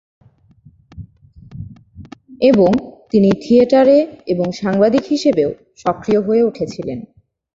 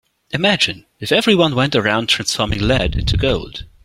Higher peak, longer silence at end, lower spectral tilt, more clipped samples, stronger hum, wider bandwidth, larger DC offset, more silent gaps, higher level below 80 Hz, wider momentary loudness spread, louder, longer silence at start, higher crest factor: about the same, -2 dBFS vs 0 dBFS; first, 0.5 s vs 0.2 s; first, -7 dB/octave vs -4.5 dB/octave; neither; neither; second, 7.8 kHz vs 16 kHz; neither; neither; second, -48 dBFS vs -30 dBFS; first, 16 LU vs 8 LU; about the same, -15 LUFS vs -16 LUFS; first, 0.95 s vs 0.35 s; about the same, 16 dB vs 16 dB